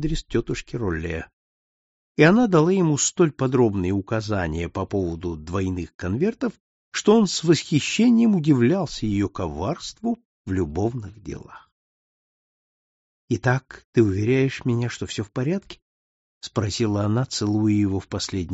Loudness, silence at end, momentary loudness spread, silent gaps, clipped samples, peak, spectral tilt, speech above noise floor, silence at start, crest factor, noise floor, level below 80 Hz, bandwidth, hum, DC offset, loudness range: -22 LUFS; 0 s; 12 LU; 1.33-2.15 s, 5.94-5.99 s, 6.60-6.92 s, 10.25-10.45 s, 11.72-13.28 s, 13.85-13.93 s, 15.82-16.41 s; under 0.1%; -2 dBFS; -6 dB/octave; over 68 dB; 0 s; 20 dB; under -90 dBFS; -44 dBFS; 8 kHz; none; under 0.1%; 9 LU